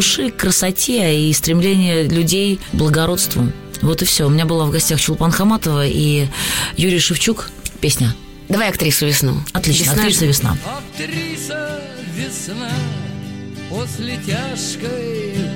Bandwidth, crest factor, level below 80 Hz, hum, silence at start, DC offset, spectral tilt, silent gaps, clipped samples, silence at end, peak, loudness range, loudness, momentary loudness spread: 17 kHz; 14 dB; -36 dBFS; none; 0 s; under 0.1%; -4 dB/octave; none; under 0.1%; 0 s; -4 dBFS; 9 LU; -16 LUFS; 11 LU